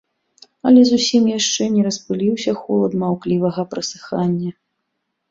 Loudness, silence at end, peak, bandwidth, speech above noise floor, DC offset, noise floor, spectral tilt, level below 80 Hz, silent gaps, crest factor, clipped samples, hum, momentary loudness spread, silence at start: -17 LUFS; 0.8 s; -2 dBFS; 7.8 kHz; 58 dB; under 0.1%; -74 dBFS; -5 dB/octave; -60 dBFS; none; 16 dB; under 0.1%; none; 12 LU; 0.65 s